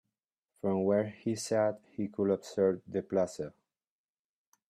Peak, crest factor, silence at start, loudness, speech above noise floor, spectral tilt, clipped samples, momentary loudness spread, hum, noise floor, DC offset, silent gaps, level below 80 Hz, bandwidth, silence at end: -16 dBFS; 18 dB; 0.65 s; -32 LUFS; 58 dB; -6 dB/octave; under 0.1%; 9 LU; none; -89 dBFS; under 0.1%; none; -76 dBFS; 14 kHz; 1.2 s